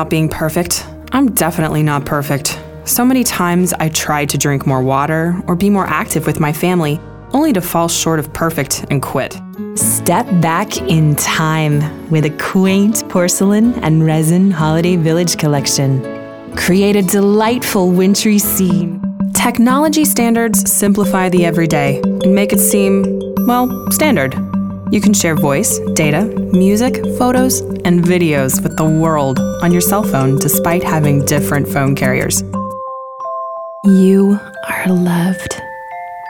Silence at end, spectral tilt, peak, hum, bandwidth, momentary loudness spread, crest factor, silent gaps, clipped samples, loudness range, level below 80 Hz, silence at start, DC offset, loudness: 0 s; -5 dB/octave; 0 dBFS; none; over 20 kHz; 8 LU; 12 dB; none; under 0.1%; 3 LU; -40 dBFS; 0 s; 0.2%; -13 LUFS